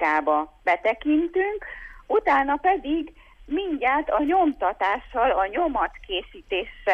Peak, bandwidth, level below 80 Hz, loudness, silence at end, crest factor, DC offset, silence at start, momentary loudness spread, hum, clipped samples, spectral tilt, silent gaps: -10 dBFS; 7 kHz; -48 dBFS; -24 LUFS; 0 s; 12 dB; under 0.1%; 0 s; 10 LU; none; under 0.1%; -5.5 dB/octave; none